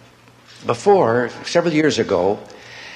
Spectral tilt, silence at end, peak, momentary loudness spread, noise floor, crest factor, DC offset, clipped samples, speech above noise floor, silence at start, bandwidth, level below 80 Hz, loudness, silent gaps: -5 dB/octave; 0 s; -2 dBFS; 14 LU; -48 dBFS; 18 dB; under 0.1%; under 0.1%; 31 dB; 0.6 s; 11 kHz; -60 dBFS; -18 LUFS; none